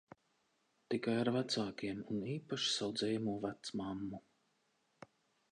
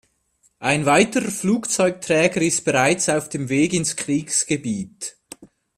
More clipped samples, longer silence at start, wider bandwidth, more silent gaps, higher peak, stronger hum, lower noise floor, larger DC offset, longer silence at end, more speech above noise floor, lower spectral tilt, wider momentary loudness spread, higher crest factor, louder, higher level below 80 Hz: neither; first, 0.9 s vs 0.6 s; second, 10.5 kHz vs 15.5 kHz; neither; second, -22 dBFS vs -2 dBFS; neither; first, -79 dBFS vs -63 dBFS; neither; first, 1.35 s vs 0.3 s; about the same, 40 dB vs 43 dB; about the same, -4.5 dB/octave vs -4 dB/octave; about the same, 8 LU vs 10 LU; about the same, 18 dB vs 20 dB; second, -39 LUFS vs -20 LUFS; second, -74 dBFS vs -58 dBFS